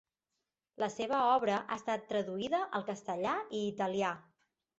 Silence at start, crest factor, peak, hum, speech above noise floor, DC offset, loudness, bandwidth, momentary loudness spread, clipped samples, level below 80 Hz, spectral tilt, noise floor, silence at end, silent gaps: 0.8 s; 20 dB; -16 dBFS; none; 54 dB; under 0.1%; -34 LUFS; 8 kHz; 9 LU; under 0.1%; -76 dBFS; -3.5 dB/octave; -88 dBFS; 0.55 s; none